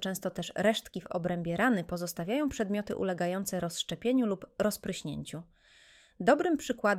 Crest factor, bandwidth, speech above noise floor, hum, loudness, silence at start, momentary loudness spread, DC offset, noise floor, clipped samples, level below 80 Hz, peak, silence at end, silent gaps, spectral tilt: 20 dB; 16.5 kHz; 29 dB; none; -32 LUFS; 0 s; 9 LU; under 0.1%; -60 dBFS; under 0.1%; -60 dBFS; -12 dBFS; 0 s; none; -5 dB/octave